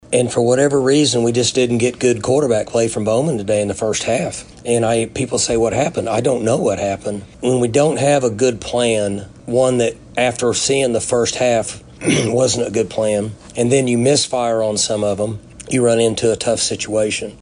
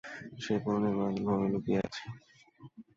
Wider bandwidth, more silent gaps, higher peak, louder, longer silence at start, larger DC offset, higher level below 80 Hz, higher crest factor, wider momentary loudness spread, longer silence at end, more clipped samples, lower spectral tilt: first, 10.5 kHz vs 7.6 kHz; neither; first, -2 dBFS vs -18 dBFS; first, -17 LUFS vs -32 LUFS; about the same, 0.1 s vs 0.05 s; neither; first, -46 dBFS vs -64 dBFS; about the same, 14 dB vs 16 dB; second, 6 LU vs 14 LU; about the same, 0.05 s vs 0.15 s; neither; second, -4.5 dB/octave vs -7 dB/octave